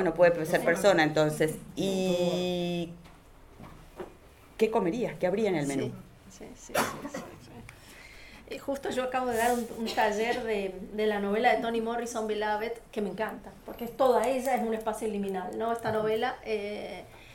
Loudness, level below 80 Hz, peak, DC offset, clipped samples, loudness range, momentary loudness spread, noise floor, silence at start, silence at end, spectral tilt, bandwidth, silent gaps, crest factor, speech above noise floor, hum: -29 LUFS; -56 dBFS; -10 dBFS; under 0.1%; under 0.1%; 5 LU; 22 LU; -53 dBFS; 0 s; 0 s; -5 dB/octave; 18.5 kHz; none; 20 dB; 24 dB; none